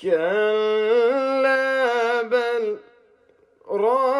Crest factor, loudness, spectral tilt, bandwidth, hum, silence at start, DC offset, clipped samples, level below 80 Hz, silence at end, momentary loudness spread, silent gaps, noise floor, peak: 12 dB; -21 LUFS; -4.5 dB/octave; 11.5 kHz; none; 0 s; under 0.1%; under 0.1%; -78 dBFS; 0 s; 7 LU; none; -58 dBFS; -10 dBFS